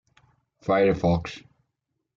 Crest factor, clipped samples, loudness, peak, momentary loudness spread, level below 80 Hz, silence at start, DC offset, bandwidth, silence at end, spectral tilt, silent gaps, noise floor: 16 dB; under 0.1%; -23 LUFS; -10 dBFS; 17 LU; -50 dBFS; 0.65 s; under 0.1%; 7.4 kHz; 0.8 s; -7.5 dB/octave; none; -80 dBFS